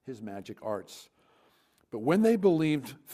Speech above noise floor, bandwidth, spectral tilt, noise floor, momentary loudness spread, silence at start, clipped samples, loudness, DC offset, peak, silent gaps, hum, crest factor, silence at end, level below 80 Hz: 38 dB; 15.5 kHz; -7 dB/octave; -67 dBFS; 19 LU; 0.05 s; under 0.1%; -28 LUFS; under 0.1%; -10 dBFS; none; none; 20 dB; 0 s; -72 dBFS